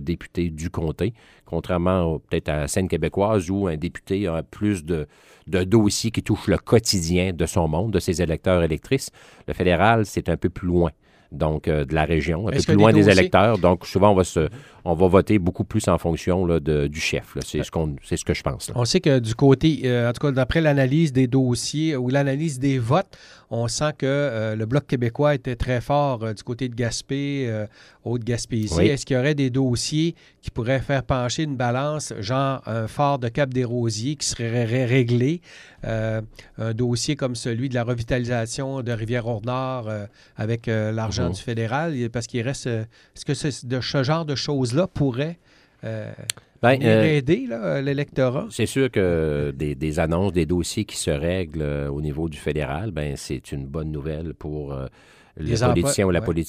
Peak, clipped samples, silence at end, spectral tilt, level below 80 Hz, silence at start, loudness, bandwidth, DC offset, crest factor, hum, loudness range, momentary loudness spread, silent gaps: 0 dBFS; under 0.1%; 0 s; -6 dB/octave; -40 dBFS; 0 s; -22 LUFS; 15.5 kHz; under 0.1%; 22 dB; none; 7 LU; 11 LU; none